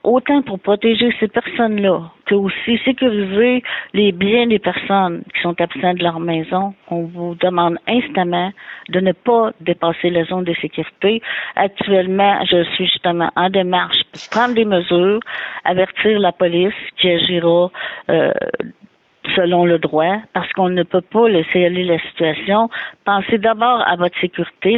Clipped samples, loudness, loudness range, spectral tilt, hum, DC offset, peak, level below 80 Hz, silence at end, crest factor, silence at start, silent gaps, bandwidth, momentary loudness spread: under 0.1%; -16 LUFS; 3 LU; -7 dB/octave; none; under 0.1%; -4 dBFS; -56 dBFS; 0 s; 14 dB; 0.05 s; none; 7 kHz; 7 LU